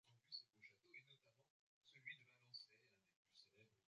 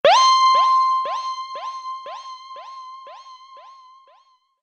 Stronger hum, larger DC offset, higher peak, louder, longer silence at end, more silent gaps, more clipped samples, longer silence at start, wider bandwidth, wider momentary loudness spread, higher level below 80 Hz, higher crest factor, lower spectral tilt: neither; neither; second, -44 dBFS vs -4 dBFS; second, -61 LUFS vs -17 LUFS; second, 0.05 s vs 1 s; first, 1.50-1.81 s, 3.16-3.25 s vs none; neither; about the same, 0.05 s vs 0.05 s; second, 7.6 kHz vs 8.8 kHz; second, 10 LU vs 24 LU; second, under -90 dBFS vs -78 dBFS; first, 24 dB vs 18 dB; about the same, 0.5 dB/octave vs 0.5 dB/octave